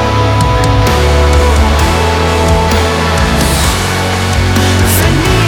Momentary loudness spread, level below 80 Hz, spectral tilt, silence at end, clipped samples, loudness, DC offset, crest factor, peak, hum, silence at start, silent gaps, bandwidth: 2 LU; -14 dBFS; -5 dB/octave; 0 s; under 0.1%; -10 LUFS; under 0.1%; 10 dB; 0 dBFS; none; 0 s; none; 19 kHz